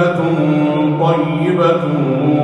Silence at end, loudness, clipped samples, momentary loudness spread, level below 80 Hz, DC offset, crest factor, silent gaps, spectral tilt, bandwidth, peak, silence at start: 0 s; -14 LUFS; under 0.1%; 2 LU; -54 dBFS; under 0.1%; 12 dB; none; -8.5 dB/octave; 8.6 kHz; -2 dBFS; 0 s